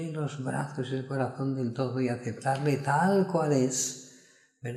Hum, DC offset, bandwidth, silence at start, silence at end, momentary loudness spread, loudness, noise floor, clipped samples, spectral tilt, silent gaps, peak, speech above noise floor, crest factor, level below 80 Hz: none; under 0.1%; 14 kHz; 0 s; 0 s; 9 LU; -29 LUFS; -59 dBFS; under 0.1%; -5.5 dB/octave; none; -12 dBFS; 30 dB; 16 dB; -72 dBFS